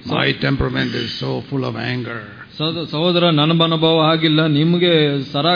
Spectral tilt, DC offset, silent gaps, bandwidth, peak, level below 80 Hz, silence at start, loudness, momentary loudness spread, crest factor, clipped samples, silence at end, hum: -7.5 dB/octave; under 0.1%; none; 5.2 kHz; -2 dBFS; -42 dBFS; 0 s; -17 LUFS; 9 LU; 14 dB; under 0.1%; 0 s; none